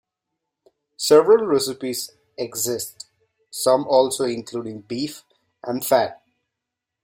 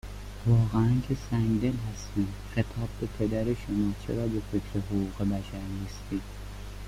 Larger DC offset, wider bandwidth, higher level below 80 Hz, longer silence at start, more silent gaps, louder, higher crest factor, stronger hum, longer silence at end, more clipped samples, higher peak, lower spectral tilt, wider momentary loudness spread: neither; about the same, 16.5 kHz vs 15 kHz; second, -66 dBFS vs -42 dBFS; first, 1 s vs 0.05 s; neither; first, -21 LUFS vs -30 LUFS; about the same, 20 dB vs 16 dB; neither; first, 0.9 s vs 0 s; neither; first, -2 dBFS vs -12 dBFS; second, -3.5 dB/octave vs -7.5 dB/octave; first, 18 LU vs 11 LU